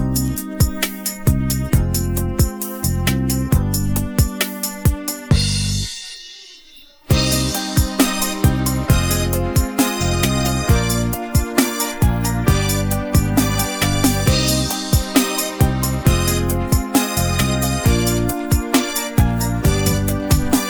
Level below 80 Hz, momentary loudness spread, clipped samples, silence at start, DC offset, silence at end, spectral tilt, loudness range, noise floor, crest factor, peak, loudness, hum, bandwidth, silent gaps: -24 dBFS; 4 LU; under 0.1%; 0 s; under 0.1%; 0 s; -4.5 dB/octave; 3 LU; -44 dBFS; 16 dB; -2 dBFS; -18 LUFS; none; over 20 kHz; none